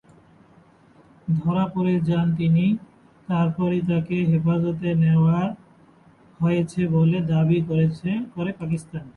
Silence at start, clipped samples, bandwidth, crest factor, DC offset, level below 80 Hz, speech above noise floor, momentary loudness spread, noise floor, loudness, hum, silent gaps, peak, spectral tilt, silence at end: 1.25 s; under 0.1%; 9.6 kHz; 14 dB; under 0.1%; -54 dBFS; 33 dB; 9 LU; -54 dBFS; -22 LUFS; none; none; -10 dBFS; -9 dB/octave; 0.05 s